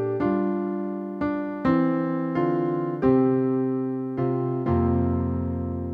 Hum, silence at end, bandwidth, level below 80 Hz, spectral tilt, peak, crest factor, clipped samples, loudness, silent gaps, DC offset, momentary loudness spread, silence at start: none; 0 s; 4.8 kHz; -44 dBFS; -11 dB/octave; -8 dBFS; 14 dB; under 0.1%; -25 LUFS; none; under 0.1%; 7 LU; 0 s